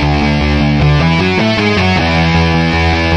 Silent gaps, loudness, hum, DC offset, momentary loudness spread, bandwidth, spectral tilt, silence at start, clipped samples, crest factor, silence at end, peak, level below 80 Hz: none; -11 LUFS; none; under 0.1%; 2 LU; 9.4 kHz; -6.5 dB/octave; 0 s; under 0.1%; 10 dB; 0 s; 0 dBFS; -20 dBFS